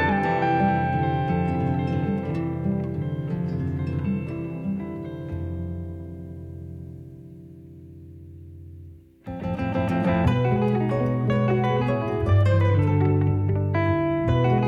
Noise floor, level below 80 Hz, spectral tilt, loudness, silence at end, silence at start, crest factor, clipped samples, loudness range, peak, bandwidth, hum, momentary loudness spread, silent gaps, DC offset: -45 dBFS; -44 dBFS; -9.5 dB/octave; -24 LUFS; 0 s; 0 s; 16 dB; under 0.1%; 16 LU; -8 dBFS; 5.6 kHz; none; 22 LU; none; under 0.1%